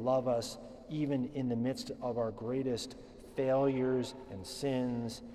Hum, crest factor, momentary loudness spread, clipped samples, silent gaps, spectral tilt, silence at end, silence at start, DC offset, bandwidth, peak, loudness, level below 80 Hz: none; 16 dB; 13 LU; under 0.1%; none; -6 dB/octave; 0 s; 0 s; under 0.1%; 13.5 kHz; -20 dBFS; -35 LUFS; -60 dBFS